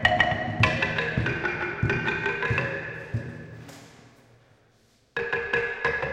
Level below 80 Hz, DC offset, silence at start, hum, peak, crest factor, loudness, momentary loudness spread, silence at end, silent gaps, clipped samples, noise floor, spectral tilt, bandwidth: -46 dBFS; under 0.1%; 0 s; none; -6 dBFS; 22 dB; -26 LUFS; 17 LU; 0 s; none; under 0.1%; -62 dBFS; -5.5 dB/octave; 12 kHz